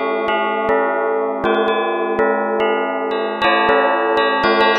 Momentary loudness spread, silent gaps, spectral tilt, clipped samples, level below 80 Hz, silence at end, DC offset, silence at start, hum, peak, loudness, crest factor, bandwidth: 5 LU; none; -5.5 dB/octave; under 0.1%; -52 dBFS; 0 s; under 0.1%; 0 s; none; 0 dBFS; -17 LUFS; 16 dB; 6.2 kHz